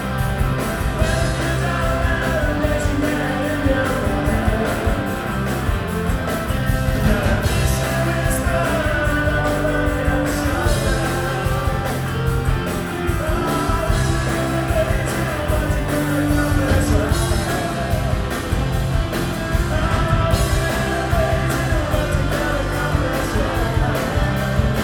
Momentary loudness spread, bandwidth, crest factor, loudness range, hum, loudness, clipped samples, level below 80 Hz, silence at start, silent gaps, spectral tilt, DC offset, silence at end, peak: 4 LU; over 20 kHz; 16 dB; 2 LU; none; -20 LUFS; under 0.1%; -24 dBFS; 0 s; none; -5.5 dB/octave; under 0.1%; 0 s; -2 dBFS